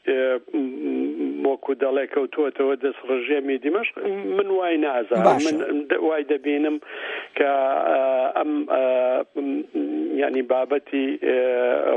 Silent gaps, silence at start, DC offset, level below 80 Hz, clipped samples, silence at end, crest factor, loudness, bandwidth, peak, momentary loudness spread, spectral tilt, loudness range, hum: none; 0.05 s; under 0.1%; -78 dBFS; under 0.1%; 0 s; 20 dB; -23 LUFS; 8.8 kHz; -2 dBFS; 6 LU; -5.5 dB/octave; 2 LU; none